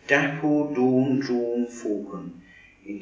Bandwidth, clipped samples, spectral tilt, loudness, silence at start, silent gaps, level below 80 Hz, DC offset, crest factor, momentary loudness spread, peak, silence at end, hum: 7.8 kHz; under 0.1%; -6.5 dB/octave; -24 LUFS; 0.05 s; none; -64 dBFS; under 0.1%; 20 dB; 17 LU; -4 dBFS; 0 s; none